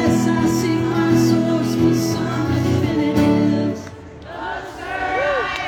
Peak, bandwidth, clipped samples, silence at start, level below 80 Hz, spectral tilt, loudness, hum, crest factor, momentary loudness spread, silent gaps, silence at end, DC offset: -4 dBFS; 18 kHz; under 0.1%; 0 s; -44 dBFS; -6 dB/octave; -18 LUFS; none; 14 dB; 13 LU; none; 0 s; under 0.1%